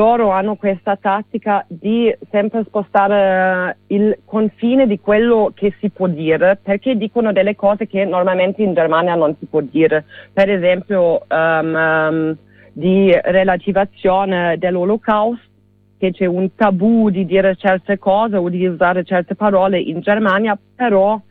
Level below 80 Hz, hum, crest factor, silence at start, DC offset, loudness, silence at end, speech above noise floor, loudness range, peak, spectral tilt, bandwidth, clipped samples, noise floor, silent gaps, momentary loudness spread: -50 dBFS; none; 14 dB; 0 s; under 0.1%; -15 LUFS; 0.1 s; 38 dB; 1 LU; -2 dBFS; -9.5 dB/octave; 4.5 kHz; under 0.1%; -53 dBFS; none; 6 LU